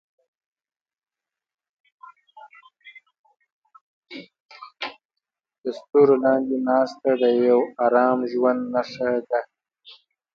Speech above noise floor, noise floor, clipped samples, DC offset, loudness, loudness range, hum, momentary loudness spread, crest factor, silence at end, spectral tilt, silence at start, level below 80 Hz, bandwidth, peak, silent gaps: 65 dB; -85 dBFS; under 0.1%; under 0.1%; -21 LUFS; 21 LU; none; 16 LU; 20 dB; 0.4 s; -7 dB/octave; 2.35 s; -72 dBFS; 7 kHz; -6 dBFS; 3.19-3.24 s, 3.52-3.62 s, 3.81-4.02 s, 4.40-4.49 s, 5.05-5.09 s, 5.58-5.62 s